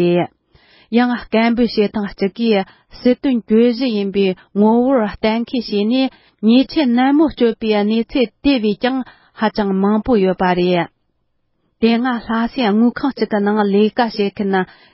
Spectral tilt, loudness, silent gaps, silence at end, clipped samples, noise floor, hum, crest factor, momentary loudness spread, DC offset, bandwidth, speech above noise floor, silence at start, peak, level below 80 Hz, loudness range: -10.5 dB/octave; -16 LUFS; none; 0.3 s; under 0.1%; -66 dBFS; none; 14 dB; 6 LU; under 0.1%; 5.8 kHz; 50 dB; 0 s; -2 dBFS; -46 dBFS; 2 LU